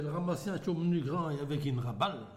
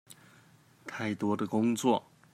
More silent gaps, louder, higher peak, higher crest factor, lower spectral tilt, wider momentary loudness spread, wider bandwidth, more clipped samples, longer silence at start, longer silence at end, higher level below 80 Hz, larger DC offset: neither; second, -34 LUFS vs -31 LUFS; second, -18 dBFS vs -12 dBFS; about the same, 16 dB vs 20 dB; first, -7 dB/octave vs -5.5 dB/octave; second, 3 LU vs 13 LU; about the same, 15 kHz vs 14.5 kHz; neither; about the same, 0 s vs 0.1 s; second, 0 s vs 0.35 s; first, -64 dBFS vs -78 dBFS; neither